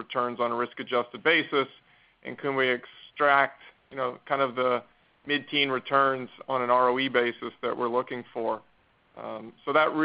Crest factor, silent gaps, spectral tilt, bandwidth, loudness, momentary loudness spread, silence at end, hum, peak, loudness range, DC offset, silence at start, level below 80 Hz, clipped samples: 20 dB; none; -8.5 dB/octave; 5.2 kHz; -27 LUFS; 14 LU; 0 s; none; -8 dBFS; 2 LU; under 0.1%; 0 s; -72 dBFS; under 0.1%